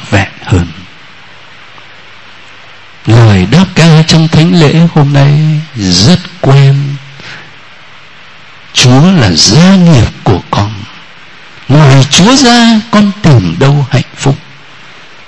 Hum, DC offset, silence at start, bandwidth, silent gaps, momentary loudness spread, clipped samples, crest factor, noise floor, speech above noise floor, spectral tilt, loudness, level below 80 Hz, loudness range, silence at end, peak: none; 2%; 0 s; 11 kHz; none; 13 LU; 3%; 8 dB; -34 dBFS; 29 dB; -5.5 dB/octave; -6 LUFS; -32 dBFS; 4 LU; 0.9 s; 0 dBFS